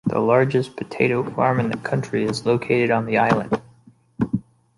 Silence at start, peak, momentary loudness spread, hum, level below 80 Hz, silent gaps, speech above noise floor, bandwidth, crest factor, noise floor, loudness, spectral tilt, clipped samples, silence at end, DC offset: 0.05 s; -2 dBFS; 9 LU; none; -54 dBFS; none; 33 dB; 11.5 kHz; 18 dB; -53 dBFS; -21 LUFS; -7 dB/octave; under 0.1%; 0.4 s; under 0.1%